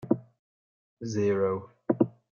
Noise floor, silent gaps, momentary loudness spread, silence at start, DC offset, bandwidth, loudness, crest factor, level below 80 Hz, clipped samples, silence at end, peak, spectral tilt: under -90 dBFS; 0.39-0.97 s; 9 LU; 0 s; under 0.1%; 7.2 kHz; -29 LUFS; 22 dB; -72 dBFS; under 0.1%; 0.3 s; -8 dBFS; -7.5 dB/octave